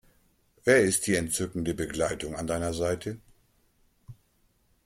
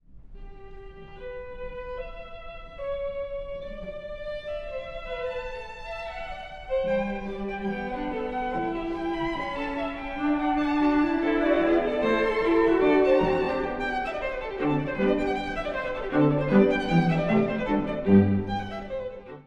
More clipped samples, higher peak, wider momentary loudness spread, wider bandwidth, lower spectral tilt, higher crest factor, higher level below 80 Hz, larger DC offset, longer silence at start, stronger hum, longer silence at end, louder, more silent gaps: neither; about the same, -8 dBFS vs -6 dBFS; second, 12 LU vs 17 LU; first, 16 kHz vs 8.4 kHz; second, -4 dB/octave vs -8 dB/octave; about the same, 22 dB vs 20 dB; second, -54 dBFS vs -44 dBFS; neither; first, 0.65 s vs 0.1 s; neither; first, 0.75 s vs 0.05 s; about the same, -28 LUFS vs -26 LUFS; neither